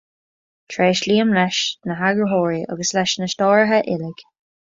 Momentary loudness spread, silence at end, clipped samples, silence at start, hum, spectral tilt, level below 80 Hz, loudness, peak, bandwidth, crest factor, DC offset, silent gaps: 8 LU; 0.45 s; under 0.1%; 0.7 s; none; -4 dB/octave; -62 dBFS; -18 LUFS; -2 dBFS; 7.8 kHz; 18 dB; under 0.1%; none